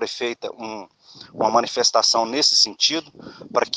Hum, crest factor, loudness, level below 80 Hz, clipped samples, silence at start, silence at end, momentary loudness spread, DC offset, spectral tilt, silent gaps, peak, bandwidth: none; 20 dB; -18 LUFS; -70 dBFS; under 0.1%; 0 s; 0 s; 16 LU; under 0.1%; -1 dB/octave; none; -2 dBFS; 10.5 kHz